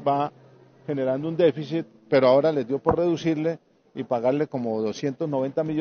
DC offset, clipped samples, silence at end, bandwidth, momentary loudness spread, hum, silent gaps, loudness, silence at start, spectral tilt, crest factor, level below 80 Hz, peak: under 0.1%; under 0.1%; 0 s; 6.8 kHz; 12 LU; none; none; -24 LUFS; 0 s; -6 dB/octave; 20 dB; -58 dBFS; -4 dBFS